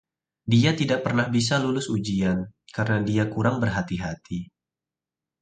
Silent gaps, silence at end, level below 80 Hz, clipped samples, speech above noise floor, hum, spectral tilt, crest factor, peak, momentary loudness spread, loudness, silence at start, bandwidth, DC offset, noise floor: none; 0.95 s; -50 dBFS; under 0.1%; 66 dB; none; -6 dB/octave; 18 dB; -6 dBFS; 13 LU; -24 LUFS; 0.45 s; 9.4 kHz; under 0.1%; -89 dBFS